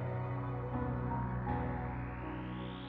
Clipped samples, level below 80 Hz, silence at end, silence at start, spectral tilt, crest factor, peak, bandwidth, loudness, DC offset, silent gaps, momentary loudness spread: under 0.1%; -48 dBFS; 0 s; 0 s; -7.5 dB/octave; 14 dB; -24 dBFS; 4.3 kHz; -39 LUFS; under 0.1%; none; 5 LU